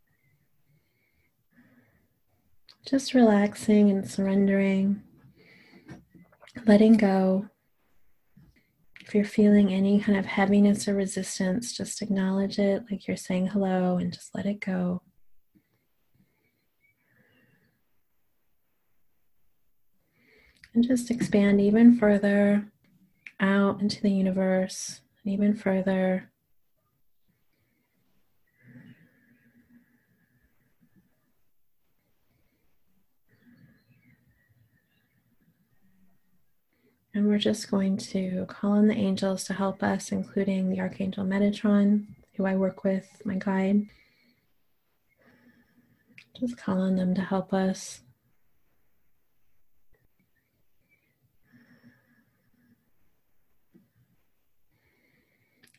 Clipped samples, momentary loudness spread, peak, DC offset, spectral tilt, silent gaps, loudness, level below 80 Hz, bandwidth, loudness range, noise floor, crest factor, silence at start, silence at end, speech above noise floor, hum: under 0.1%; 12 LU; -6 dBFS; under 0.1%; -6.5 dB/octave; none; -25 LUFS; -64 dBFS; 12 kHz; 10 LU; -77 dBFS; 22 dB; 2.85 s; 7.8 s; 53 dB; none